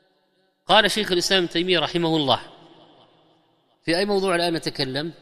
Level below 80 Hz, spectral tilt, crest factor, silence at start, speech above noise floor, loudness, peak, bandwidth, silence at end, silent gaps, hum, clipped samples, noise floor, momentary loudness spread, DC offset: -54 dBFS; -4 dB/octave; 22 dB; 0.7 s; 45 dB; -21 LUFS; -2 dBFS; 14.5 kHz; 0.1 s; none; none; under 0.1%; -66 dBFS; 9 LU; under 0.1%